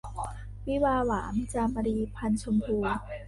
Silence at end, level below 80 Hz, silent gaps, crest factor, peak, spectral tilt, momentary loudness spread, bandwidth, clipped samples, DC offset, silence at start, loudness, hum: 0 s; -42 dBFS; none; 14 dB; -14 dBFS; -6.5 dB/octave; 11 LU; 11.5 kHz; under 0.1%; under 0.1%; 0.05 s; -30 LUFS; 50 Hz at -40 dBFS